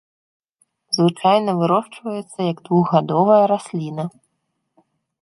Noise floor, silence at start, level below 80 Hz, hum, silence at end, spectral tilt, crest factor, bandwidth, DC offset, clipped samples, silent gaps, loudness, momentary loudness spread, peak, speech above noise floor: -73 dBFS; 0.9 s; -68 dBFS; none; 1.1 s; -6.5 dB/octave; 18 dB; 11.5 kHz; under 0.1%; under 0.1%; none; -19 LUFS; 14 LU; -2 dBFS; 56 dB